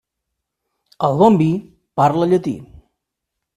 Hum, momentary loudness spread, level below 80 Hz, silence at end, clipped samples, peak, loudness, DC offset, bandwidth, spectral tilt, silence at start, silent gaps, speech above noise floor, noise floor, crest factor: none; 14 LU; -54 dBFS; 0.9 s; under 0.1%; 0 dBFS; -16 LUFS; under 0.1%; 13 kHz; -8.5 dB/octave; 1 s; none; 64 dB; -80 dBFS; 18 dB